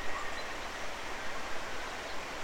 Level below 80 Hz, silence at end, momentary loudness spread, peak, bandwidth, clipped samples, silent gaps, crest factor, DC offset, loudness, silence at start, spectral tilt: -52 dBFS; 0 s; 2 LU; -20 dBFS; 16 kHz; under 0.1%; none; 14 dB; under 0.1%; -39 LUFS; 0 s; -2.5 dB/octave